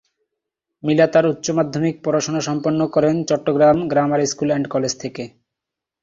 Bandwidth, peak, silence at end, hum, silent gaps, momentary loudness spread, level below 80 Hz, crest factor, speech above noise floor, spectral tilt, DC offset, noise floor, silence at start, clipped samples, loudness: 7.8 kHz; -2 dBFS; 0.75 s; none; none; 10 LU; -56 dBFS; 18 dB; 66 dB; -5.5 dB/octave; under 0.1%; -84 dBFS; 0.85 s; under 0.1%; -18 LUFS